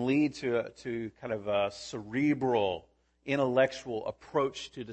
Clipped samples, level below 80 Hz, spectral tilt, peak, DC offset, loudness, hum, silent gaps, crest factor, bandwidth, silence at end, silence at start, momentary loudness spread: under 0.1%; -66 dBFS; -6 dB/octave; -14 dBFS; under 0.1%; -31 LUFS; none; none; 18 dB; 8.6 kHz; 0 s; 0 s; 10 LU